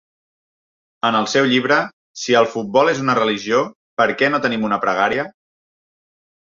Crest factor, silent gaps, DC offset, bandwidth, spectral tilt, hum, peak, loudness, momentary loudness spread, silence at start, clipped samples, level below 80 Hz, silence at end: 18 dB; 1.93-2.14 s, 3.75-3.97 s; under 0.1%; 7.6 kHz; -4 dB/octave; none; -2 dBFS; -17 LUFS; 7 LU; 1.05 s; under 0.1%; -60 dBFS; 1.2 s